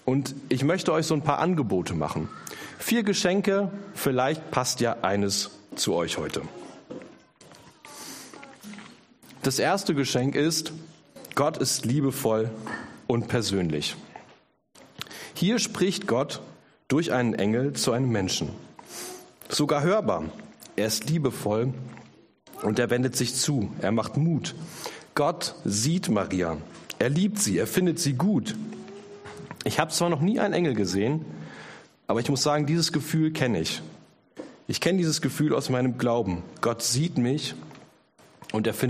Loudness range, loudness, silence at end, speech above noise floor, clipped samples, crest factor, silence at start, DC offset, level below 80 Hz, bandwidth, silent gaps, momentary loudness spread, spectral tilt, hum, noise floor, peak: 3 LU; -26 LUFS; 0 s; 32 dB; under 0.1%; 22 dB; 0.05 s; under 0.1%; -60 dBFS; 15.5 kHz; none; 17 LU; -4.5 dB/octave; none; -58 dBFS; -4 dBFS